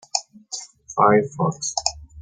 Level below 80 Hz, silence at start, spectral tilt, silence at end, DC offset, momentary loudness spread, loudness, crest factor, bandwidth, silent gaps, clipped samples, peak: -52 dBFS; 0.15 s; -4 dB/octave; 0 s; under 0.1%; 16 LU; -21 LUFS; 22 dB; 9.8 kHz; none; under 0.1%; -2 dBFS